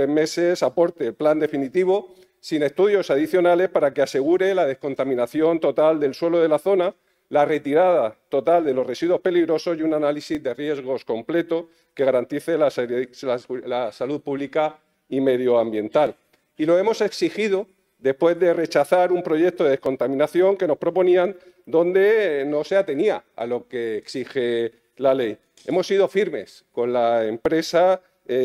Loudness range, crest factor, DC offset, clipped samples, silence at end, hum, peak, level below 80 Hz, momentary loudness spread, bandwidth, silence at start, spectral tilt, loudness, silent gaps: 4 LU; 16 dB; under 0.1%; under 0.1%; 0 s; none; -4 dBFS; -68 dBFS; 9 LU; 13.5 kHz; 0 s; -6 dB/octave; -21 LUFS; none